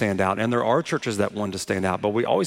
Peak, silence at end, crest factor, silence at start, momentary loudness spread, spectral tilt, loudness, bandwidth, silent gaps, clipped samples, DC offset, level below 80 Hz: -6 dBFS; 0 s; 16 dB; 0 s; 4 LU; -5.5 dB/octave; -24 LUFS; 16.5 kHz; none; under 0.1%; under 0.1%; -60 dBFS